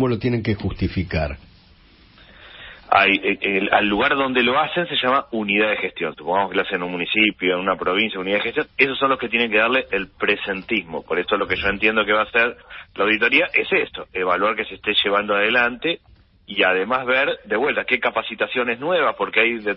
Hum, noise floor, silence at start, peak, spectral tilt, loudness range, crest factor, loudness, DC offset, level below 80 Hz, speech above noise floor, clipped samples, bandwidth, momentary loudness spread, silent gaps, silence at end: none; -51 dBFS; 0 s; -2 dBFS; -9.5 dB/octave; 2 LU; 20 dB; -19 LUFS; under 0.1%; -46 dBFS; 30 dB; under 0.1%; 5.8 kHz; 8 LU; none; 0 s